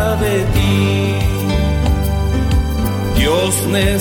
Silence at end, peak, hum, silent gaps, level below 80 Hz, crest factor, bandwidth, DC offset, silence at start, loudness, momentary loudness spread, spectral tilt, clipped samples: 0 s; -2 dBFS; none; none; -20 dBFS; 12 dB; 19.5 kHz; under 0.1%; 0 s; -16 LUFS; 3 LU; -5.5 dB/octave; under 0.1%